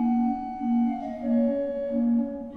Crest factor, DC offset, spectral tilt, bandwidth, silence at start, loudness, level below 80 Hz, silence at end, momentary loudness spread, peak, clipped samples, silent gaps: 10 dB; under 0.1%; -9.5 dB/octave; 3.6 kHz; 0 s; -26 LUFS; -56 dBFS; 0 s; 4 LU; -16 dBFS; under 0.1%; none